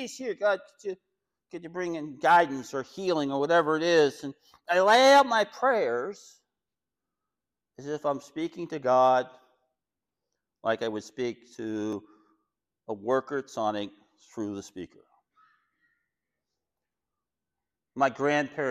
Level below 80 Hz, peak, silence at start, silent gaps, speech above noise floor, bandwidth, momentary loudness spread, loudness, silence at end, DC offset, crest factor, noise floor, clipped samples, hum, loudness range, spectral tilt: -74 dBFS; -12 dBFS; 0 s; none; 63 dB; 15 kHz; 20 LU; -26 LUFS; 0 s; under 0.1%; 18 dB; -90 dBFS; under 0.1%; none; 13 LU; -4 dB/octave